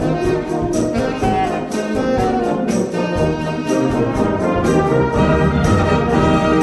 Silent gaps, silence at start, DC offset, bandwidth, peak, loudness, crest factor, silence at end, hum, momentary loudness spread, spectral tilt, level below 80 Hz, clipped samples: none; 0 s; under 0.1%; 12.5 kHz; -2 dBFS; -17 LUFS; 14 dB; 0 s; none; 5 LU; -6.5 dB/octave; -30 dBFS; under 0.1%